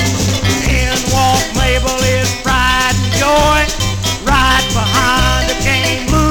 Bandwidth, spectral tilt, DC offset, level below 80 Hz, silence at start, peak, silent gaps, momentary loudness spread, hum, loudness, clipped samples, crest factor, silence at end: 19 kHz; -3.5 dB/octave; 0.2%; -20 dBFS; 0 s; 0 dBFS; none; 3 LU; none; -12 LUFS; under 0.1%; 12 dB; 0 s